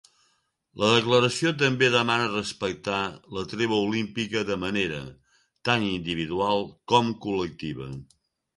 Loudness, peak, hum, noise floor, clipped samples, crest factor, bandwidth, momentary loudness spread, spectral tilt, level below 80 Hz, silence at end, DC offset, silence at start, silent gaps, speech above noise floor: -25 LUFS; -4 dBFS; none; -70 dBFS; under 0.1%; 22 dB; 11.5 kHz; 13 LU; -4.5 dB/octave; -56 dBFS; 0.5 s; under 0.1%; 0.75 s; none; 45 dB